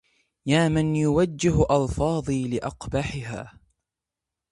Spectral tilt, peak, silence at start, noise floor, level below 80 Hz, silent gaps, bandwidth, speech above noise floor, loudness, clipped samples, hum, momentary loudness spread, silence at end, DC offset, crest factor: -6.5 dB/octave; -6 dBFS; 0.45 s; -87 dBFS; -42 dBFS; none; 11.5 kHz; 64 dB; -24 LUFS; under 0.1%; none; 14 LU; 1.05 s; under 0.1%; 18 dB